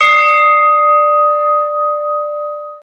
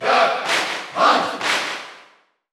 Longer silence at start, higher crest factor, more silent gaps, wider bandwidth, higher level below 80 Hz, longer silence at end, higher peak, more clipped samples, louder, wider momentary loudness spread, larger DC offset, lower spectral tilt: about the same, 0 s vs 0 s; second, 12 dB vs 18 dB; neither; second, 8 kHz vs 15.5 kHz; first, -66 dBFS vs -74 dBFS; second, 0.05 s vs 0.5 s; about the same, 0 dBFS vs -2 dBFS; neither; first, -11 LUFS vs -19 LUFS; about the same, 11 LU vs 12 LU; neither; second, 0 dB/octave vs -1.5 dB/octave